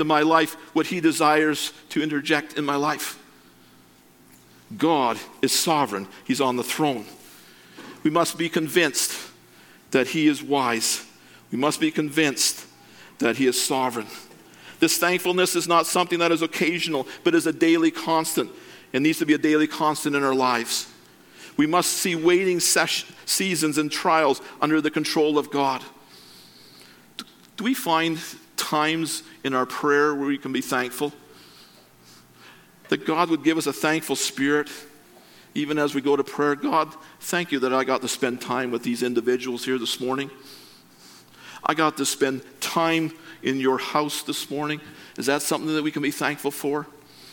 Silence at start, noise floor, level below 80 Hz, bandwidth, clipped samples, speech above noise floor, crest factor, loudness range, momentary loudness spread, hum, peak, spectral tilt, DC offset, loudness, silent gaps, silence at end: 0 s; -54 dBFS; -72 dBFS; 17.5 kHz; under 0.1%; 31 dB; 22 dB; 5 LU; 11 LU; none; -2 dBFS; -3 dB/octave; under 0.1%; -23 LUFS; none; 0 s